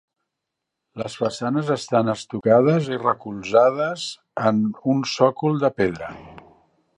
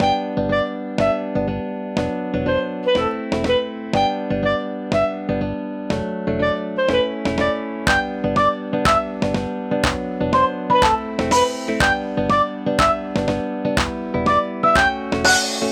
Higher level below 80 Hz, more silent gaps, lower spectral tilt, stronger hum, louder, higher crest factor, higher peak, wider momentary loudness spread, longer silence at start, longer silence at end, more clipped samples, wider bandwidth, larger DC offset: second, -58 dBFS vs -38 dBFS; neither; first, -6 dB/octave vs -4.5 dB/octave; neither; about the same, -21 LUFS vs -20 LUFS; about the same, 20 dB vs 18 dB; about the same, -2 dBFS vs -2 dBFS; first, 14 LU vs 7 LU; first, 0.95 s vs 0 s; first, 0.6 s vs 0 s; neither; second, 10.5 kHz vs 18 kHz; neither